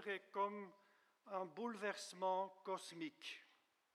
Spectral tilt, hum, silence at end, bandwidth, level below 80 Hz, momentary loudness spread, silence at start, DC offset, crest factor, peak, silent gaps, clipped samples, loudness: -3.5 dB/octave; none; 0.5 s; 14.5 kHz; under -90 dBFS; 11 LU; 0 s; under 0.1%; 18 dB; -30 dBFS; none; under 0.1%; -46 LUFS